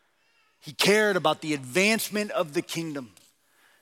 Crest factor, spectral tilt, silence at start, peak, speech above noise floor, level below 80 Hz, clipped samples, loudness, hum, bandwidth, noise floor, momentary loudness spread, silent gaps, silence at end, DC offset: 20 dB; -3.5 dB/octave; 0.65 s; -8 dBFS; 41 dB; -78 dBFS; under 0.1%; -25 LUFS; none; 17 kHz; -67 dBFS; 13 LU; none; 0.75 s; under 0.1%